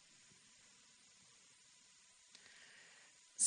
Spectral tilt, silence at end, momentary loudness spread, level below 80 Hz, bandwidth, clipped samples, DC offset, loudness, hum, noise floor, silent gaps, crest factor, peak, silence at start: 2 dB/octave; 0 s; 4 LU; under -90 dBFS; 10 kHz; under 0.1%; under 0.1%; -62 LUFS; none; -68 dBFS; none; 28 dB; -22 dBFS; 3.4 s